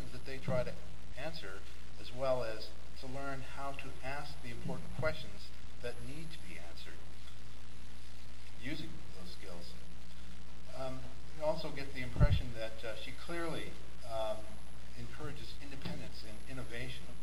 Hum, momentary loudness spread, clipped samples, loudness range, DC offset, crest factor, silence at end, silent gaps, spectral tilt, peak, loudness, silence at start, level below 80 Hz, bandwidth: none; 15 LU; under 0.1%; 10 LU; 3%; 28 dB; 0 s; none; -5.5 dB/octave; -14 dBFS; -43 LUFS; 0 s; -48 dBFS; 16 kHz